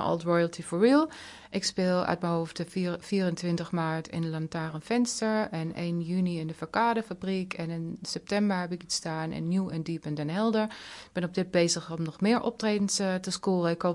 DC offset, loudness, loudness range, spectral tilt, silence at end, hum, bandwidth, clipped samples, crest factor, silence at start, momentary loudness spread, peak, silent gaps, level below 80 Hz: under 0.1%; -29 LUFS; 3 LU; -5 dB/octave; 0 s; none; 11.5 kHz; under 0.1%; 20 dB; 0 s; 8 LU; -10 dBFS; none; -64 dBFS